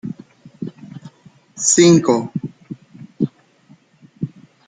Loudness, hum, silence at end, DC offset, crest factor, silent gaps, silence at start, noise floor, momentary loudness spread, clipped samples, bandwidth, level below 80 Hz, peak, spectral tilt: -15 LUFS; none; 0.4 s; under 0.1%; 18 dB; none; 0.05 s; -51 dBFS; 26 LU; under 0.1%; 9.6 kHz; -60 dBFS; -2 dBFS; -4.5 dB/octave